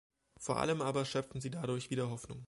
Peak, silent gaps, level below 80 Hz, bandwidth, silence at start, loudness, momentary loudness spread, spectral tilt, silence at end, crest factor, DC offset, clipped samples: -18 dBFS; none; -64 dBFS; 11.5 kHz; 0.4 s; -37 LUFS; 7 LU; -5.5 dB/octave; 0 s; 20 dB; under 0.1%; under 0.1%